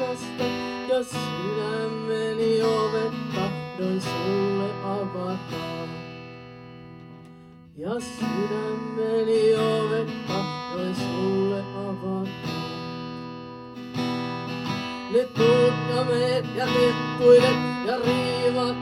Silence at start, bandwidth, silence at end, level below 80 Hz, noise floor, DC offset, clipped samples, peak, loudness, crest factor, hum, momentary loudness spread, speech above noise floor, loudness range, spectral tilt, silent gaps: 0 s; 13.5 kHz; 0 s; -60 dBFS; -47 dBFS; under 0.1%; under 0.1%; -6 dBFS; -25 LUFS; 20 dB; none; 15 LU; 23 dB; 11 LU; -6 dB/octave; none